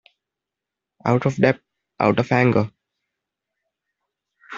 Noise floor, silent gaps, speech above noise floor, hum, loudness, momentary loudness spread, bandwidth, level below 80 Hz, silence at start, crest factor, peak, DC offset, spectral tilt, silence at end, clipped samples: -86 dBFS; none; 67 dB; none; -20 LUFS; 11 LU; 7.4 kHz; -58 dBFS; 1.05 s; 20 dB; -2 dBFS; under 0.1%; -8 dB/octave; 0 s; under 0.1%